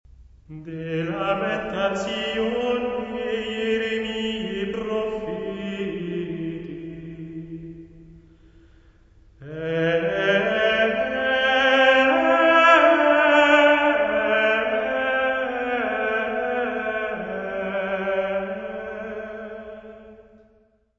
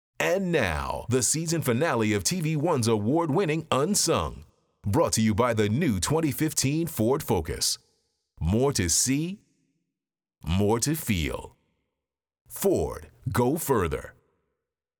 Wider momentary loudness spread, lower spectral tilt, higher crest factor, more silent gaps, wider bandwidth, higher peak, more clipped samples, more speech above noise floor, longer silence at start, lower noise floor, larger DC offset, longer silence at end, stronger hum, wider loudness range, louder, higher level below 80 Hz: first, 20 LU vs 10 LU; about the same, -5 dB/octave vs -4.5 dB/octave; about the same, 20 dB vs 18 dB; second, none vs 12.41-12.45 s; second, 8 kHz vs over 20 kHz; first, -4 dBFS vs -10 dBFS; neither; second, 35 dB vs 64 dB; about the same, 0.2 s vs 0.2 s; second, -60 dBFS vs -89 dBFS; neither; second, 0.75 s vs 0.9 s; neither; first, 15 LU vs 5 LU; first, -21 LUFS vs -25 LUFS; second, -54 dBFS vs -48 dBFS